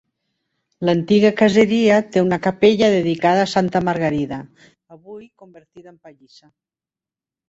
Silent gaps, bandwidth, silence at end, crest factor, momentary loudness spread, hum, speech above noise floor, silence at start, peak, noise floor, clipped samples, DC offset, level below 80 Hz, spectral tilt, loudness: none; 8 kHz; 1.4 s; 18 dB; 8 LU; none; 72 dB; 0.8 s; -2 dBFS; -90 dBFS; under 0.1%; under 0.1%; -56 dBFS; -6 dB/octave; -17 LUFS